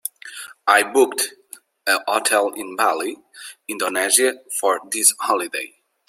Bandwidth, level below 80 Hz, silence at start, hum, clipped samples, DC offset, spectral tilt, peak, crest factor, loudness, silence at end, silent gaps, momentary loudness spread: 16.5 kHz; -74 dBFS; 0.05 s; none; under 0.1%; under 0.1%; 0.5 dB/octave; 0 dBFS; 22 dB; -19 LUFS; 0.4 s; none; 17 LU